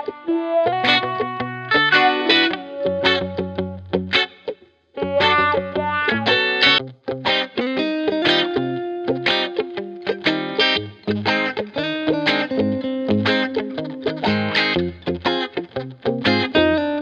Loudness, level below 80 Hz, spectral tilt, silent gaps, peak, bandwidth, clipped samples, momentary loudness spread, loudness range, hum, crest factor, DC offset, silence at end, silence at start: -19 LUFS; -52 dBFS; -5.5 dB/octave; none; -2 dBFS; 8.6 kHz; under 0.1%; 11 LU; 3 LU; none; 18 dB; under 0.1%; 0 s; 0 s